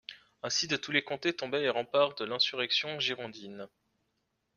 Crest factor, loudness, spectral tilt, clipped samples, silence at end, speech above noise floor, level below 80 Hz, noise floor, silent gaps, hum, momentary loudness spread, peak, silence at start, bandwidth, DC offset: 22 dB; -30 LUFS; -2.5 dB/octave; under 0.1%; 0.9 s; 48 dB; -76 dBFS; -80 dBFS; none; none; 17 LU; -12 dBFS; 0.1 s; 7.4 kHz; under 0.1%